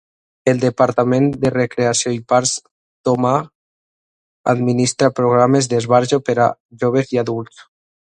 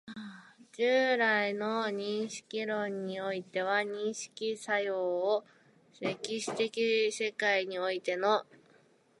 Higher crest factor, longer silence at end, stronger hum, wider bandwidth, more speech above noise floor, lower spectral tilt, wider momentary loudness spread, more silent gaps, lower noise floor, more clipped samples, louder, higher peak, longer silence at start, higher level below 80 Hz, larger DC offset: about the same, 16 dB vs 18 dB; second, 0.5 s vs 0.75 s; neither; about the same, 11 kHz vs 11.5 kHz; first, over 74 dB vs 33 dB; first, -5 dB/octave vs -3.5 dB/octave; about the same, 8 LU vs 9 LU; first, 2.71-3.04 s, 3.55-4.44 s, 6.60-6.69 s vs none; first, under -90 dBFS vs -65 dBFS; neither; first, -17 LUFS vs -32 LUFS; first, 0 dBFS vs -14 dBFS; first, 0.45 s vs 0.05 s; first, -54 dBFS vs -84 dBFS; neither